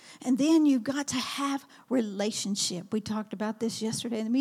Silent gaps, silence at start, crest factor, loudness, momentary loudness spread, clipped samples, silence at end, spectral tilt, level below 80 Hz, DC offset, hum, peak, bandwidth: none; 0.05 s; 14 dB; -29 LUFS; 9 LU; under 0.1%; 0 s; -4 dB/octave; -74 dBFS; under 0.1%; none; -14 dBFS; 15.5 kHz